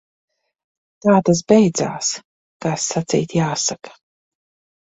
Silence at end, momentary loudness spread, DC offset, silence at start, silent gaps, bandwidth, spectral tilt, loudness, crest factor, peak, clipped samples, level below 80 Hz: 0.95 s; 11 LU; under 0.1%; 1.05 s; 2.24-2.60 s; 8.2 kHz; -5 dB/octave; -18 LUFS; 20 dB; 0 dBFS; under 0.1%; -56 dBFS